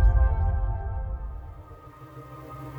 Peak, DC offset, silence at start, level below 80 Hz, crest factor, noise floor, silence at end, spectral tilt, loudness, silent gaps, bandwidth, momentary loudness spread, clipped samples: -10 dBFS; under 0.1%; 0 s; -26 dBFS; 16 dB; -46 dBFS; 0 s; -9.5 dB/octave; -29 LUFS; none; 2.8 kHz; 21 LU; under 0.1%